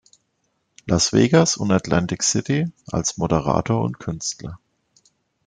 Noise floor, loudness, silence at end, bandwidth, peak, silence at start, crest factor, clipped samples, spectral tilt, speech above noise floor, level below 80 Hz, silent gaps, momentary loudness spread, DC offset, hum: -71 dBFS; -20 LUFS; 0.9 s; 9.6 kHz; -2 dBFS; 0.85 s; 20 dB; under 0.1%; -4.5 dB/octave; 51 dB; -48 dBFS; none; 11 LU; under 0.1%; none